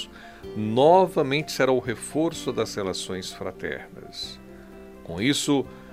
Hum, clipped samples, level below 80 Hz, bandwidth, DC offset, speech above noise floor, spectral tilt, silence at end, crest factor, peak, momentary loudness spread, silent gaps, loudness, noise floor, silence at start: none; under 0.1%; -54 dBFS; 16 kHz; 0.1%; 20 dB; -4.5 dB/octave; 0 s; 20 dB; -6 dBFS; 22 LU; none; -24 LUFS; -44 dBFS; 0 s